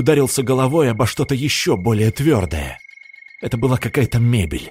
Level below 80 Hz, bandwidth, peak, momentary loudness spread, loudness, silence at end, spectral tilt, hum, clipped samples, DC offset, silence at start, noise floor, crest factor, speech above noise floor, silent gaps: -38 dBFS; 16 kHz; -2 dBFS; 10 LU; -18 LUFS; 0 s; -5.5 dB/octave; none; under 0.1%; under 0.1%; 0 s; -42 dBFS; 16 dB; 25 dB; none